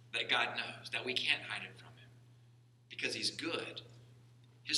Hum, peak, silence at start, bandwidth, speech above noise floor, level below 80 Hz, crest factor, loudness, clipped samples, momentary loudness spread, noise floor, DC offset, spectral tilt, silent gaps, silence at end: none; -16 dBFS; 0 s; 15 kHz; 25 dB; -82 dBFS; 24 dB; -36 LUFS; under 0.1%; 17 LU; -64 dBFS; under 0.1%; -2 dB/octave; none; 0 s